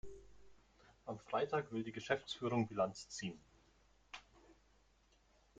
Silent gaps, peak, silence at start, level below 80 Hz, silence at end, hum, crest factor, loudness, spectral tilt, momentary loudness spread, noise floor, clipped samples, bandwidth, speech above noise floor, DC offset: none; -20 dBFS; 0.05 s; -70 dBFS; 1.05 s; none; 24 dB; -41 LUFS; -5 dB/octave; 17 LU; -73 dBFS; under 0.1%; 9 kHz; 32 dB; under 0.1%